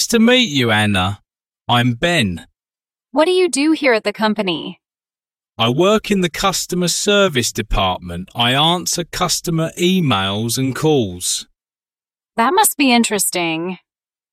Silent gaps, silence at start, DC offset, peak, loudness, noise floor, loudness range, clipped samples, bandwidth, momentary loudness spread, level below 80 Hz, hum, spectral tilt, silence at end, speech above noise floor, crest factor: none; 0 s; under 0.1%; 0 dBFS; -16 LUFS; under -90 dBFS; 2 LU; under 0.1%; 16.5 kHz; 10 LU; -38 dBFS; none; -3.5 dB/octave; 0.55 s; over 74 dB; 18 dB